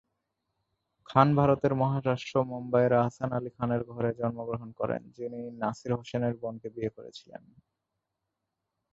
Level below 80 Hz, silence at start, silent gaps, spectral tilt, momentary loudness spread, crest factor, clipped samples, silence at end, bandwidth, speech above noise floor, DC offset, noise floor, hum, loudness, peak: -62 dBFS; 1.1 s; none; -8 dB/octave; 14 LU; 24 dB; under 0.1%; 1.55 s; 7.8 kHz; 56 dB; under 0.1%; -85 dBFS; none; -29 LUFS; -6 dBFS